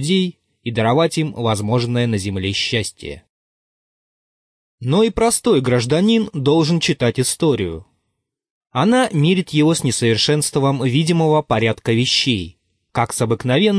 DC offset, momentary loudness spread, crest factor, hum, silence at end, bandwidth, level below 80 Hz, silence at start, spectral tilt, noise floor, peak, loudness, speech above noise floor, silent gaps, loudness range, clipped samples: under 0.1%; 9 LU; 14 dB; none; 0 s; 11 kHz; -48 dBFS; 0 s; -5 dB/octave; -75 dBFS; -4 dBFS; -17 LUFS; 58 dB; 3.29-4.78 s, 8.50-8.61 s; 5 LU; under 0.1%